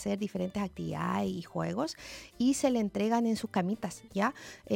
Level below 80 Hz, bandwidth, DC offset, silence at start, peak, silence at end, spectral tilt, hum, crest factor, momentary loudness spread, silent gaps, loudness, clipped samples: -60 dBFS; 16.5 kHz; under 0.1%; 0 s; -14 dBFS; 0 s; -5.5 dB/octave; none; 16 dB; 8 LU; none; -32 LUFS; under 0.1%